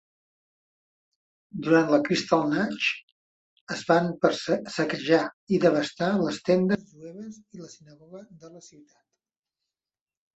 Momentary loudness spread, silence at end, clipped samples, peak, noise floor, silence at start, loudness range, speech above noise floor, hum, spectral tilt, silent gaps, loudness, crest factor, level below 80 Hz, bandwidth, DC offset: 20 LU; 1.7 s; under 0.1%; -6 dBFS; under -90 dBFS; 1.55 s; 6 LU; over 64 dB; none; -5.5 dB/octave; 3.03-3.67 s, 5.33-5.47 s; -25 LUFS; 22 dB; -68 dBFS; 8.2 kHz; under 0.1%